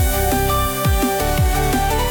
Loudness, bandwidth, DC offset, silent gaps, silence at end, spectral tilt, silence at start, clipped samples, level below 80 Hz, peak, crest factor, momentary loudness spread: -18 LUFS; 19.5 kHz; under 0.1%; none; 0 s; -4.5 dB/octave; 0 s; under 0.1%; -22 dBFS; -8 dBFS; 10 dB; 1 LU